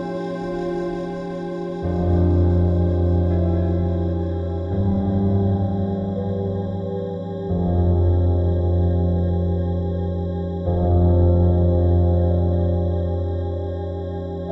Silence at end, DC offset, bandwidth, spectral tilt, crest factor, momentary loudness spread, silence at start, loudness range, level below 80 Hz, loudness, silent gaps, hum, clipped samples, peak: 0 s; under 0.1%; 5.4 kHz; -11 dB/octave; 12 dB; 9 LU; 0 s; 3 LU; -36 dBFS; -21 LUFS; none; none; under 0.1%; -8 dBFS